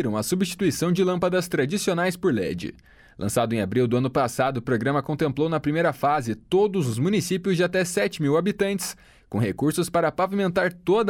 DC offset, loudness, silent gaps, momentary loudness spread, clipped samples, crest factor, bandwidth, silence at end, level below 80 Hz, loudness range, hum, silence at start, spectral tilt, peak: under 0.1%; -24 LUFS; none; 4 LU; under 0.1%; 14 dB; 17.5 kHz; 0 s; -54 dBFS; 1 LU; none; 0 s; -5.5 dB/octave; -10 dBFS